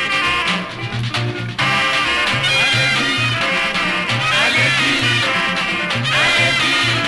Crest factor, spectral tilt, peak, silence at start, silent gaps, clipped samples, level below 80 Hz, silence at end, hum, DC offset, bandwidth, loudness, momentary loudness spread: 12 dB; -3 dB/octave; -4 dBFS; 0 s; none; under 0.1%; -44 dBFS; 0 s; none; under 0.1%; 11.5 kHz; -15 LUFS; 8 LU